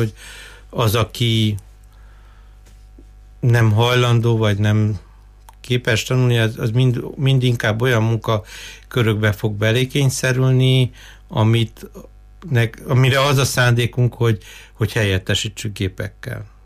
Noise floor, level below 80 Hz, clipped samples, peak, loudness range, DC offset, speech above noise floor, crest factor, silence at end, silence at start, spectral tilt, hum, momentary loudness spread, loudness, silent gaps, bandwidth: -43 dBFS; -42 dBFS; under 0.1%; -6 dBFS; 2 LU; under 0.1%; 26 dB; 14 dB; 0.2 s; 0 s; -5.5 dB/octave; none; 12 LU; -18 LUFS; none; 15.5 kHz